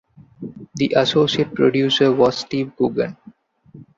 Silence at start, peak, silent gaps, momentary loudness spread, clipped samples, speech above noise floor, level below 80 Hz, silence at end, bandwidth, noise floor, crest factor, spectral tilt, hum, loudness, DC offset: 0.4 s; -2 dBFS; none; 18 LU; under 0.1%; 30 dB; -56 dBFS; 0.15 s; 7.8 kHz; -47 dBFS; 18 dB; -5.5 dB/octave; none; -18 LUFS; under 0.1%